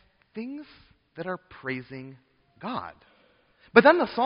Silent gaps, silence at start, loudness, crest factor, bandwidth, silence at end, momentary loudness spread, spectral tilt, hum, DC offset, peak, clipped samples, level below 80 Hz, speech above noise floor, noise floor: none; 0.35 s; -24 LUFS; 26 dB; 5.4 kHz; 0 s; 25 LU; -3 dB/octave; none; under 0.1%; -2 dBFS; under 0.1%; -66 dBFS; 37 dB; -63 dBFS